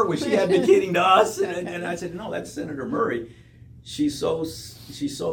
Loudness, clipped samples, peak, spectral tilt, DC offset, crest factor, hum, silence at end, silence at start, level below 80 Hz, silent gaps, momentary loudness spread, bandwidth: -23 LUFS; under 0.1%; -4 dBFS; -5 dB/octave; under 0.1%; 20 dB; none; 0 s; 0 s; -56 dBFS; none; 15 LU; 18 kHz